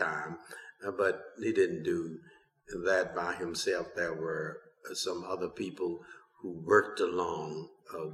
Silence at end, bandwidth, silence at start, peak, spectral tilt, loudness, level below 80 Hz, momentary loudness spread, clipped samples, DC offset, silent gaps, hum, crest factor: 0 s; 13.5 kHz; 0 s; -10 dBFS; -4 dB/octave; -33 LUFS; -68 dBFS; 16 LU; under 0.1%; under 0.1%; none; none; 24 dB